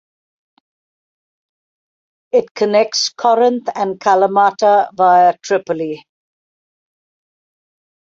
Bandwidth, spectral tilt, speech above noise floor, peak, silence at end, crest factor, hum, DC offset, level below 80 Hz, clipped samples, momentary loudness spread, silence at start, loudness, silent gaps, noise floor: 7.8 kHz; -3.5 dB/octave; over 76 dB; 0 dBFS; 2 s; 16 dB; none; under 0.1%; -68 dBFS; under 0.1%; 9 LU; 2.35 s; -14 LUFS; 2.51-2.55 s; under -90 dBFS